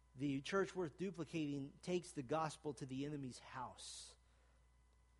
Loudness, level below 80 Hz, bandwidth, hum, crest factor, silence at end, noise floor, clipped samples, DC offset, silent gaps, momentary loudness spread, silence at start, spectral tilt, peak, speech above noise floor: -46 LUFS; -72 dBFS; 11.5 kHz; none; 18 dB; 1.05 s; -72 dBFS; under 0.1%; under 0.1%; none; 11 LU; 0.15 s; -5.5 dB/octave; -28 dBFS; 27 dB